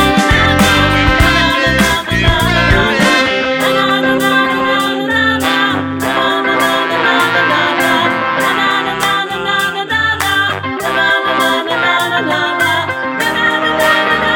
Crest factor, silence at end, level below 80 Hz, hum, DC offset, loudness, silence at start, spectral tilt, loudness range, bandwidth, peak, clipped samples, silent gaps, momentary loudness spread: 12 dB; 0 s; -28 dBFS; none; under 0.1%; -12 LUFS; 0 s; -4 dB/octave; 3 LU; 19 kHz; 0 dBFS; under 0.1%; none; 4 LU